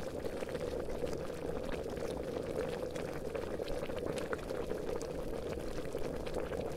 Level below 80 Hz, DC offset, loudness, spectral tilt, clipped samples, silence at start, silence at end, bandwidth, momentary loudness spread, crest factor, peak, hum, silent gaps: -48 dBFS; under 0.1%; -40 LUFS; -5.5 dB/octave; under 0.1%; 0 s; 0 s; 16 kHz; 2 LU; 20 dB; -18 dBFS; none; none